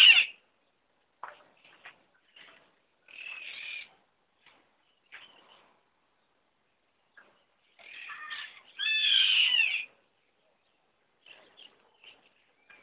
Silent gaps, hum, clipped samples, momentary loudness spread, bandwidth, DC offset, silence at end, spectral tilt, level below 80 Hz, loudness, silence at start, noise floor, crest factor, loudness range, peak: none; none; under 0.1%; 27 LU; 4 kHz; under 0.1%; 3 s; 7.5 dB/octave; under -90 dBFS; -24 LUFS; 0 s; -75 dBFS; 26 dB; 21 LU; -6 dBFS